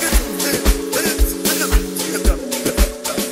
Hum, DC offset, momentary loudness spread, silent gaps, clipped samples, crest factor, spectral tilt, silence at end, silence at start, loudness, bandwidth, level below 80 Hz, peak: none; under 0.1%; 3 LU; none; under 0.1%; 16 dB; -3.5 dB/octave; 0 s; 0 s; -18 LUFS; 16.5 kHz; -20 dBFS; 0 dBFS